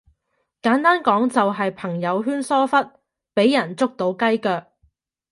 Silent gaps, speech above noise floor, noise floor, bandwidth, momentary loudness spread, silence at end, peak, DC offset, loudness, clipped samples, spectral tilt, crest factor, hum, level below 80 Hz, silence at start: none; 53 dB; -73 dBFS; 11.5 kHz; 8 LU; 0.7 s; -2 dBFS; under 0.1%; -20 LUFS; under 0.1%; -5.5 dB/octave; 18 dB; none; -68 dBFS; 0.65 s